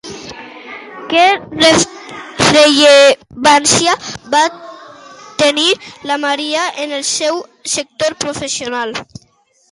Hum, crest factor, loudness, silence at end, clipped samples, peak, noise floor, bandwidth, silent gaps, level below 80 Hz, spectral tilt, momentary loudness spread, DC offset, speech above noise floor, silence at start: none; 14 dB; -12 LUFS; 0.7 s; under 0.1%; 0 dBFS; -54 dBFS; 11.5 kHz; none; -50 dBFS; -2 dB/octave; 21 LU; under 0.1%; 42 dB; 0.05 s